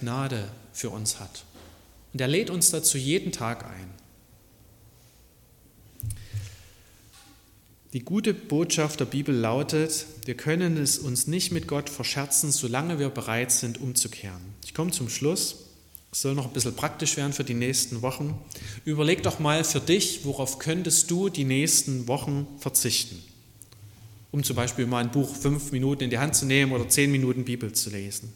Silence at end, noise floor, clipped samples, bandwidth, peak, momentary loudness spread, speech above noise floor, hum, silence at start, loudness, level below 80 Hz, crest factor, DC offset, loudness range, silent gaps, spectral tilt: 0 s; -57 dBFS; under 0.1%; 17.5 kHz; -6 dBFS; 15 LU; 30 dB; none; 0 s; -25 LUFS; -54 dBFS; 22 dB; under 0.1%; 10 LU; none; -3.5 dB/octave